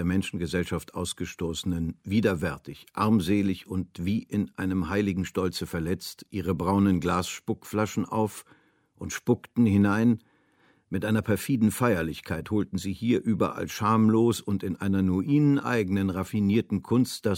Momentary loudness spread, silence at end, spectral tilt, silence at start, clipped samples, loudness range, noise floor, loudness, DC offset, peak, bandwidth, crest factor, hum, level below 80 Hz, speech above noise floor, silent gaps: 10 LU; 0 s; -6.5 dB/octave; 0 s; under 0.1%; 4 LU; -64 dBFS; -27 LUFS; under 0.1%; -8 dBFS; 17 kHz; 18 dB; none; -52 dBFS; 38 dB; none